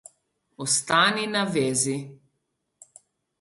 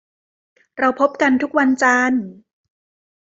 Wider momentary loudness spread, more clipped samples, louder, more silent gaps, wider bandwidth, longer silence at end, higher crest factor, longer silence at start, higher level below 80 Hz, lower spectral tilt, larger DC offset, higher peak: first, 14 LU vs 11 LU; neither; second, -23 LUFS vs -17 LUFS; neither; first, 12 kHz vs 8 kHz; first, 1.25 s vs 0.9 s; about the same, 20 dB vs 18 dB; second, 0.6 s vs 0.75 s; about the same, -68 dBFS vs -64 dBFS; second, -2.5 dB/octave vs -4 dB/octave; neither; second, -6 dBFS vs -2 dBFS